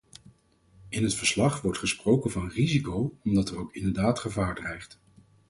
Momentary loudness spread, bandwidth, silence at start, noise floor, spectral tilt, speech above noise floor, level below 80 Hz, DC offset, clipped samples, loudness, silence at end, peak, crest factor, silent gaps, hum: 10 LU; 11.5 kHz; 0.8 s; -61 dBFS; -5 dB/octave; 34 dB; -48 dBFS; under 0.1%; under 0.1%; -28 LUFS; 0.65 s; -10 dBFS; 18 dB; none; none